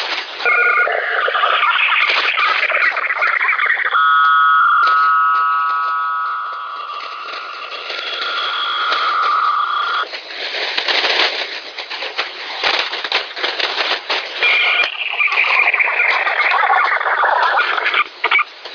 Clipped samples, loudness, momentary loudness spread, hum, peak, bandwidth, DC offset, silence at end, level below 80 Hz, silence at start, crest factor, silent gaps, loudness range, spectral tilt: under 0.1%; -15 LUFS; 12 LU; none; -2 dBFS; 5.4 kHz; under 0.1%; 0 s; -70 dBFS; 0 s; 16 dB; none; 6 LU; 0.5 dB/octave